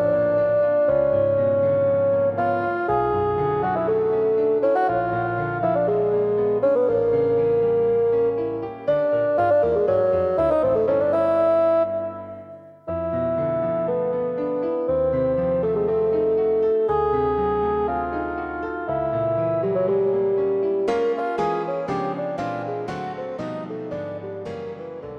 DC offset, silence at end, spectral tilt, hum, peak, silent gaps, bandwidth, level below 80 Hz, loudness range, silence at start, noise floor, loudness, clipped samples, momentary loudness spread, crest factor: under 0.1%; 0 s; -9 dB/octave; none; -10 dBFS; none; 6.6 kHz; -48 dBFS; 5 LU; 0 s; -41 dBFS; -22 LUFS; under 0.1%; 10 LU; 12 dB